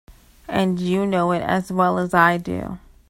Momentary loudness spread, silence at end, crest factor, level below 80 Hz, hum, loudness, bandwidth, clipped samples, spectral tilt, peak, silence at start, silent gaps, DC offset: 11 LU; 0.3 s; 20 dB; -48 dBFS; none; -20 LUFS; 16 kHz; under 0.1%; -6.5 dB/octave; 0 dBFS; 0.1 s; none; under 0.1%